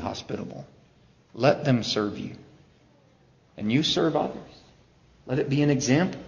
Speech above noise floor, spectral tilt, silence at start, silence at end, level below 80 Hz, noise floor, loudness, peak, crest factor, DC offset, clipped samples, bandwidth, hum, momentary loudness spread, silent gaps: 34 dB; -5.5 dB/octave; 0 s; 0 s; -56 dBFS; -59 dBFS; -25 LUFS; -6 dBFS; 20 dB; under 0.1%; under 0.1%; 7.4 kHz; none; 17 LU; none